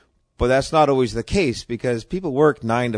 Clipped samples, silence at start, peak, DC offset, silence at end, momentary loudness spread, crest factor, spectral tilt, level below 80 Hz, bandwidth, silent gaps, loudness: under 0.1%; 0.4 s; -4 dBFS; under 0.1%; 0 s; 8 LU; 16 dB; -6 dB/octave; -38 dBFS; 10.5 kHz; none; -20 LUFS